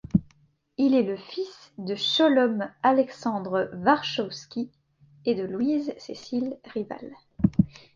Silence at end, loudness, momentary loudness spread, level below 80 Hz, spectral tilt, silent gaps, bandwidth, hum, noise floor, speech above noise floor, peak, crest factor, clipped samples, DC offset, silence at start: 0.25 s; -26 LUFS; 14 LU; -54 dBFS; -6.5 dB/octave; none; 7.4 kHz; none; -63 dBFS; 38 dB; -6 dBFS; 20 dB; under 0.1%; under 0.1%; 0.15 s